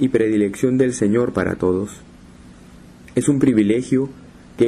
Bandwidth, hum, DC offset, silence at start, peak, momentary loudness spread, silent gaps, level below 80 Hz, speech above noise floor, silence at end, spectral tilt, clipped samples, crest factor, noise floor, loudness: 12.5 kHz; none; under 0.1%; 0 s; -4 dBFS; 8 LU; none; -48 dBFS; 25 dB; 0 s; -6.5 dB/octave; under 0.1%; 14 dB; -43 dBFS; -19 LUFS